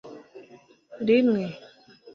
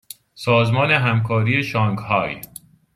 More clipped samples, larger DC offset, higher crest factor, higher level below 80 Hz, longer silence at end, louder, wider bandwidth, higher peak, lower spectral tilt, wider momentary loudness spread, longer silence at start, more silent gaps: neither; neither; about the same, 18 dB vs 18 dB; second, -70 dBFS vs -54 dBFS; second, 0.05 s vs 0.5 s; second, -24 LUFS vs -19 LUFS; second, 6.4 kHz vs 15.5 kHz; second, -10 dBFS vs -2 dBFS; first, -8 dB/octave vs -6.5 dB/octave; first, 24 LU vs 14 LU; second, 0.05 s vs 0.35 s; neither